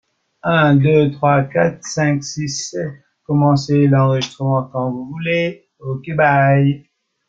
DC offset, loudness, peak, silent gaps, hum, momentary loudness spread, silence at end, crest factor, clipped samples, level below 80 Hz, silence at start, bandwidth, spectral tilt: under 0.1%; -16 LUFS; -2 dBFS; none; none; 12 LU; 0.5 s; 14 dB; under 0.1%; -54 dBFS; 0.45 s; 7.6 kHz; -6.5 dB/octave